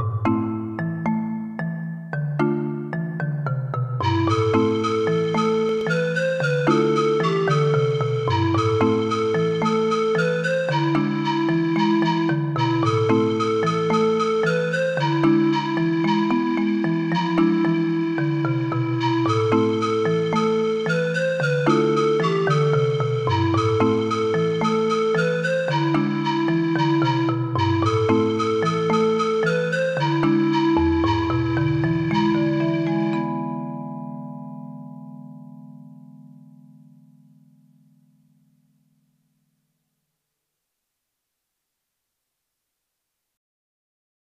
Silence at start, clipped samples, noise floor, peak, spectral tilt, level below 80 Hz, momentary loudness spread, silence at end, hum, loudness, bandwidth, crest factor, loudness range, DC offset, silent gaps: 0 s; under 0.1%; -80 dBFS; -6 dBFS; -7 dB/octave; -52 dBFS; 7 LU; 8.1 s; none; -21 LUFS; 9.4 kHz; 16 dB; 5 LU; under 0.1%; none